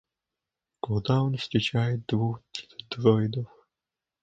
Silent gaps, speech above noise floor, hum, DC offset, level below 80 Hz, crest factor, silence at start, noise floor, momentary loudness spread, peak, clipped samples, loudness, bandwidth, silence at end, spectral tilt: none; 63 dB; none; under 0.1%; -58 dBFS; 22 dB; 0.85 s; -89 dBFS; 15 LU; -6 dBFS; under 0.1%; -27 LUFS; 7.8 kHz; 0.75 s; -7 dB/octave